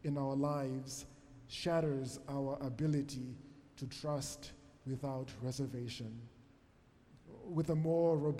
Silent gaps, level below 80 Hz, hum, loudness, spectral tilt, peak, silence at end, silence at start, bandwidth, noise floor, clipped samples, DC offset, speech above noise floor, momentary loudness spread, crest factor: none; -64 dBFS; none; -39 LUFS; -6.5 dB/octave; -24 dBFS; 0 s; 0 s; 15 kHz; -66 dBFS; under 0.1%; under 0.1%; 28 dB; 19 LU; 16 dB